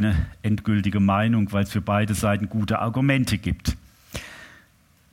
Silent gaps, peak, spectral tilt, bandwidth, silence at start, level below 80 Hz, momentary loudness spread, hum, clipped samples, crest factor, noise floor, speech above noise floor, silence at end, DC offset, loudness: none; -6 dBFS; -6.5 dB/octave; 16.5 kHz; 0 s; -38 dBFS; 16 LU; none; under 0.1%; 16 dB; -58 dBFS; 36 dB; 0.65 s; under 0.1%; -23 LUFS